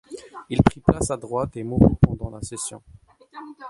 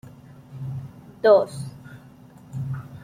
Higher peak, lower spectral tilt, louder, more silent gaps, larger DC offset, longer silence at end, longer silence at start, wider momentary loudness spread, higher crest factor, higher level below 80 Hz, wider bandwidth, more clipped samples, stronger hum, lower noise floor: first, 0 dBFS vs -4 dBFS; about the same, -7 dB/octave vs -7 dB/octave; about the same, -22 LUFS vs -23 LUFS; neither; neither; about the same, 0 s vs 0 s; about the same, 0.1 s vs 0.05 s; second, 21 LU vs 26 LU; about the same, 22 dB vs 22 dB; first, -36 dBFS vs -58 dBFS; second, 11.5 kHz vs 13.5 kHz; neither; neither; about the same, -44 dBFS vs -47 dBFS